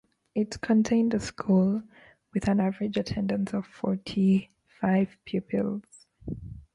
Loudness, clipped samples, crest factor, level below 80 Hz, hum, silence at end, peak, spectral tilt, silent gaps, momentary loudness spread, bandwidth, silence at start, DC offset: -27 LUFS; under 0.1%; 14 dB; -54 dBFS; none; 0.15 s; -12 dBFS; -7 dB/octave; none; 11 LU; 11 kHz; 0.35 s; under 0.1%